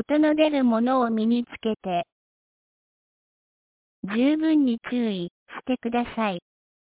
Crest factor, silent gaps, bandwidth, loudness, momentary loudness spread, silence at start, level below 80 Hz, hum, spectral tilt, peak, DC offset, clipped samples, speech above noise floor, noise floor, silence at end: 16 dB; 2.12-4.03 s, 5.31-5.46 s; 4 kHz; -24 LUFS; 13 LU; 0 s; -64 dBFS; none; -10 dB/octave; -8 dBFS; under 0.1%; under 0.1%; over 67 dB; under -90 dBFS; 0.55 s